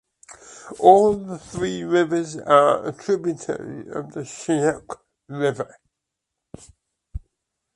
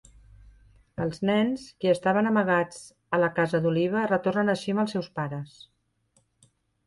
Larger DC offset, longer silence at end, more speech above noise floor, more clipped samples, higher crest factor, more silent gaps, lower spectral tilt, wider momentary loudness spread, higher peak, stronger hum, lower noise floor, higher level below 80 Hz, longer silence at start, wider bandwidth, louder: neither; second, 0.55 s vs 1.4 s; first, 62 dB vs 43 dB; neither; first, 22 dB vs 16 dB; neither; about the same, -5.5 dB/octave vs -6.5 dB/octave; first, 24 LU vs 11 LU; first, 0 dBFS vs -10 dBFS; neither; first, -82 dBFS vs -69 dBFS; first, -50 dBFS vs -60 dBFS; second, 0.3 s vs 1 s; about the same, 11.5 kHz vs 11.5 kHz; first, -21 LUFS vs -26 LUFS